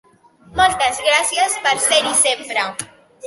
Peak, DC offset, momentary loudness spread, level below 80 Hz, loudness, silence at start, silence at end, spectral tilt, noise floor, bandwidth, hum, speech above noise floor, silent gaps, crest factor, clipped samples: -2 dBFS; under 0.1%; 12 LU; -48 dBFS; -16 LUFS; 0.5 s; 0 s; 0 dB/octave; -48 dBFS; 12 kHz; none; 31 dB; none; 16 dB; under 0.1%